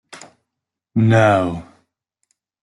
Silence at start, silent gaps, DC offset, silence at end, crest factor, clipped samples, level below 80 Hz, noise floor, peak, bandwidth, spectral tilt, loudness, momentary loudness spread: 0.15 s; none; under 0.1%; 1 s; 18 dB; under 0.1%; -54 dBFS; -82 dBFS; -2 dBFS; 11 kHz; -7.5 dB/octave; -16 LUFS; 13 LU